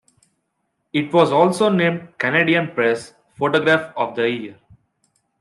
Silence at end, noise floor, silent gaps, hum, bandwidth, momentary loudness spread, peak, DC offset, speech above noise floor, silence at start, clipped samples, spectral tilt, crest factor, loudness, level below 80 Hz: 0.9 s; -73 dBFS; none; none; 12.5 kHz; 9 LU; -2 dBFS; under 0.1%; 55 dB; 0.95 s; under 0.1%; -6 dB/octave; 18 dB; -18 LUFS; -66 dBFS